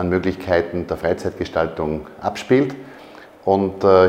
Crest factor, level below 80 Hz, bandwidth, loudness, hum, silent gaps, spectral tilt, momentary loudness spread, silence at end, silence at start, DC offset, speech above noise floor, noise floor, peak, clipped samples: 20 dB; -48 dBFS; 14.5 kHz; -21 LUFS; none; none; -7 dB/octave; 9 LU; 0 s; 0 s; under 0.1%; 23 dB; -42 dBFS; 0 dBFS; under 0.1%